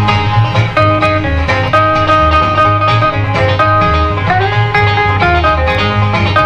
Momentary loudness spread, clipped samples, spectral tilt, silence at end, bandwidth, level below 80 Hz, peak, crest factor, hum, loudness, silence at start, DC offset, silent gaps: 3 LU; under 0.1%; -6.5 dB/octave; 0 s; 8.2 kHz; -24 dBFS; 0 dBFS; 10 dB; none; -10 LUFS; 0 s; under 0.1%; none